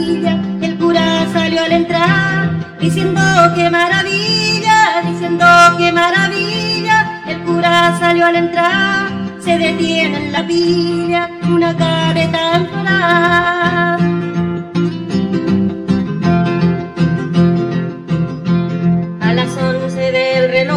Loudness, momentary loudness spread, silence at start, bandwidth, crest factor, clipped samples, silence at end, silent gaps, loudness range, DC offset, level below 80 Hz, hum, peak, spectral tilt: -13 LUFS; 7 LU; 0 s; 11.5 kHz; 14 dB; under 0.1%; 0 s; none; 5 LU; under 0.1%; -48 dBFS; none; 0 dBFS; -5.5 dB/octave